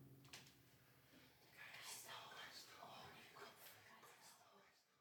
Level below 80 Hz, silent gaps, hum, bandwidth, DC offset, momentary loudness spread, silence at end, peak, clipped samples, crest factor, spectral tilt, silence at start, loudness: under -90 dBFS; none; none; over 20 kHz; under 0.1%; 14 LU; 0 s; -42 dBFS; under 0.1%; 20 dB; -1.5 dB/octave; 0 s; -59 LUFS